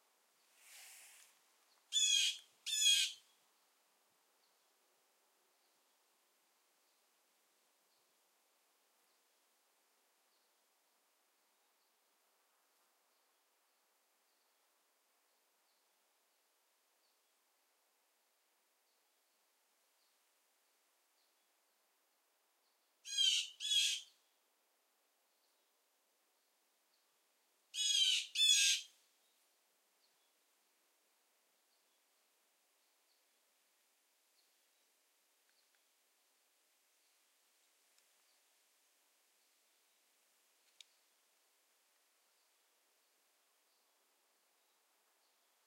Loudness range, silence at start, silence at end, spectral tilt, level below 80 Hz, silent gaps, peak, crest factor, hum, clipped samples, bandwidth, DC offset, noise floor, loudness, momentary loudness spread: 7 LU; 0.75 s; 16.8 s; 8 dB/octave; under -90 dBFS; none; -20 dBFS; 28 dB; none; under 0.1%; 16 kHz; under 0.1%; -80 dBFS; -33 LUFS; 10 LU